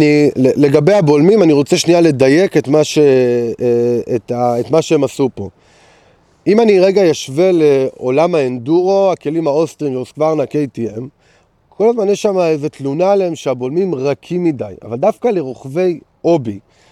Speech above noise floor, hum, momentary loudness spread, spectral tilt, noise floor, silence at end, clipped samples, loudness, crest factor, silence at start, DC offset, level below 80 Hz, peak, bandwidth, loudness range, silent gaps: 40 dB; none; 10 LU; -6.5 dB/octave; -53 dBFS; 0.3 s; under 0.1%; -13 LUFS; 14 dB; 0 s; under 0.1%; -56 dBFS; 0 dBFS; 13 kHz; 6 LU; none